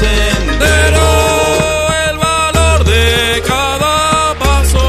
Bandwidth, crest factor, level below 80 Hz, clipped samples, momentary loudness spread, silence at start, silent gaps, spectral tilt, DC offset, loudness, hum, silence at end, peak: 15 kHz; 10 dB; -16 dBFS; under 0.1%; 3 LU; 0 s; none; -4 dB/octave; under 0.1%; -11 LUFS; none; 0 s; 0 dBFS